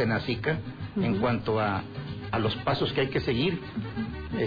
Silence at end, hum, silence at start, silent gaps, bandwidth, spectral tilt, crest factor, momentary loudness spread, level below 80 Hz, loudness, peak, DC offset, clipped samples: 0 s; none; 0 s; none; 5 kHz; -8.5 dB/octave; 12 dB; 8 LU; -48 dBFS; -29 LUFS; -16 dBFS; under 0.1%; under 0.1%